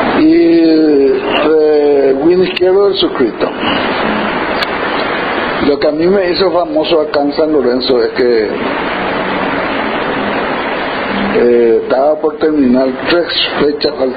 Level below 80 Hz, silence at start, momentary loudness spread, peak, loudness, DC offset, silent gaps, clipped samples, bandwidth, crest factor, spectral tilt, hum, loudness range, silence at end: -42 dBFS; 0 s; 6 LU; 0 dBFS; -12 LUFS; under 0.1%; none; under 0.1%; 5 kHz; 12 dB; -3 dB/octave; none; 3 LU; 0 s